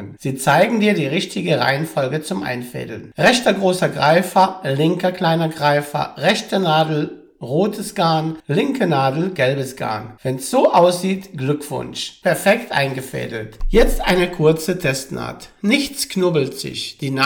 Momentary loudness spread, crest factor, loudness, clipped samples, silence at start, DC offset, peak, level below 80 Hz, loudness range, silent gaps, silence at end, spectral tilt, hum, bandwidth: 11 LU; 16 dB; -18 LUFS; under 0.1%; 0 s; under 0.1%; -4 dBFS; -34 dBFS; 2 LU; none; 0 s; -5 dB/octave; none; over 20 kHz